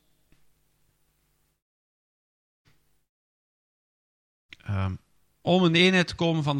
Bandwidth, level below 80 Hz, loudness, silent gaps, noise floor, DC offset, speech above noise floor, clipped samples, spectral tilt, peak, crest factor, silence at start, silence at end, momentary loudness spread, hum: 10.5 kHz; -60 dBFS; -23 LUFS; none; -71 dBFS; under 0.1%; 48 dB; under 0.1%; -6 dB/octave; -4 dBFS; 24 dB; 4.65 s; 0 s; 17 LU; none